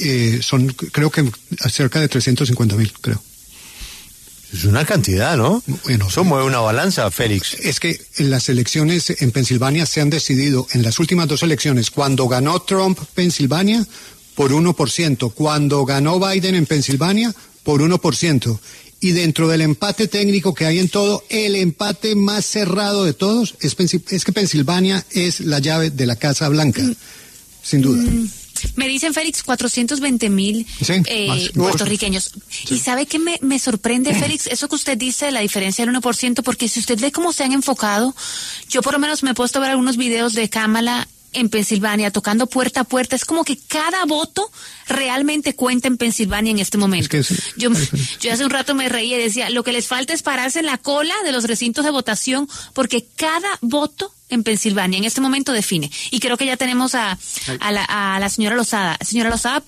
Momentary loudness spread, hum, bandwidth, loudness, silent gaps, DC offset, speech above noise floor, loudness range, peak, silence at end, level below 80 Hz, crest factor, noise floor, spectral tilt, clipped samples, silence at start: 5 LU; none; 13.5 kHz; -17 LUFS; none; under 0.1%; 24 dB; 2 LU; -2 dBFS; 0.05 s; -42 dBFS; 14 dB; -41 dBFS; -4.5 dB/octave; under 0.1%; 0 s